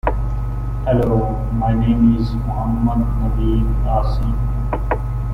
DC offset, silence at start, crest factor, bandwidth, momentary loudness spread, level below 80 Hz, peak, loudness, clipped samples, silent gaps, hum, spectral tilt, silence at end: under 0.1%; 0.05 s; 16 dB; 5.2 kHz; 7 LU; -20 dBFS; -2 dBFS; -19 LUFS; under 0.1%; none; 50 Hz at -20 dBFS; -10 dB/octave; 0 s